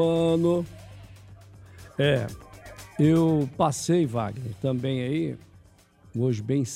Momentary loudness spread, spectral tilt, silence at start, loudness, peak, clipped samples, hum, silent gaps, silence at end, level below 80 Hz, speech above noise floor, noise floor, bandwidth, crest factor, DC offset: 20 LU; -6.5 dB/octave; 0 s; -25 LUFS; -10 dBFS; under 0.1%; none; none; 0 s; -54 dBFS; 31 dB; -55 dBFS; 15 kHz; 16 dB; under 0.1%